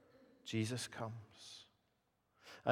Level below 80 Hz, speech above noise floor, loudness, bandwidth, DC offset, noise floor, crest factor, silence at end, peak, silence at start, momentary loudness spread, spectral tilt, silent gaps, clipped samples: -84 dBFS; 37 dB; -45 LUFS; 15.5 kHz; under 0.1%; -81 dBFS; 26 dB; 0 s; -18 dBFS; 0.15 s; 18 LU; -5 dB/octave; none; under 0.1%